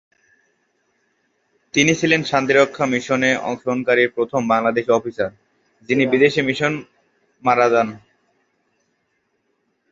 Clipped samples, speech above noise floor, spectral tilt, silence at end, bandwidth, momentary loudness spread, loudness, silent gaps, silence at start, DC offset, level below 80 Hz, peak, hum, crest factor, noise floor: under 0.1%; 51 dB; -4.5 dB/octave; 1.95 s; 7.8 kHz; 8 LU; -18 LUFS; none; 1.75 s; under 0.1%; -60 dBFS; -2 dBFS; none; 20 dB; -69 dBFS